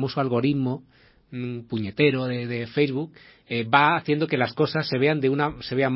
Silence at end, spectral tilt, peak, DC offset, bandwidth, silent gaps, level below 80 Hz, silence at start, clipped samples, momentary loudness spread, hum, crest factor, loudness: 0 s; -10.5 dB/octave; -2 dBFS; under 0.1%; 5.8 kHz; none; -58 dBFS; 0 s; under 0.1%; 12 LU; none; 22 dB; -24 LUFS